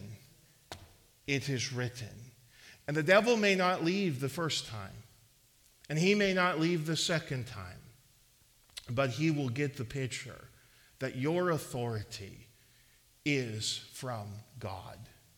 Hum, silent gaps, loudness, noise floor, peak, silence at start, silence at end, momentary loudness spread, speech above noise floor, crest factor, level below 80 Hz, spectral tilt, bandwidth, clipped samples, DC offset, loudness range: none; none; -32 LUFS; -65 dBFS; -12 dBFS; 0 s; 0.3 s; 22 LU; 33 dB; 22 dB; -66 dBFS; -4.5 dB/octave; 18.5 kHz; under 0.1%; under 0.1%; 7 LU